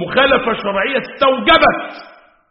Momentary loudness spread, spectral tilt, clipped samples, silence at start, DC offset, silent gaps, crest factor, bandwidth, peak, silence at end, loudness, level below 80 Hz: 9 LU; -1 dB/octave; under 0.1%; 0 s; under 0.1%; none; 16 dB; 5.8 kHz; 0 dBFS; 0.45 s; -14 LUFS; -42 dBFS